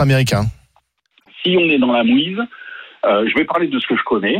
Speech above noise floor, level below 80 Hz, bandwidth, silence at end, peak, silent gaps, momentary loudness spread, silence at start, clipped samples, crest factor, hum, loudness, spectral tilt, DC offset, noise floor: 45 dB; -46 dBFS; 16 kHz; 0 s; -4 dBFS; none; 11 LU; 0 s; under 0.1%; 12 dB; none; -16 LUFS; -6 dB/octave; under 0.1%; -61 dBFS